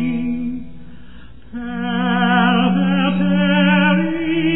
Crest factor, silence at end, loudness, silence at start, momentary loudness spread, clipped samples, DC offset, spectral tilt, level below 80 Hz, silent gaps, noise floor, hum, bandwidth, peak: 14 dB; 0 s; -16 LUFS; 0 s; 14 LU; under 0.1%; 2%; -10.5 dB/octave; -44 dBFS; none; -41 dBFS; none; 4 kHz; -4 dBFS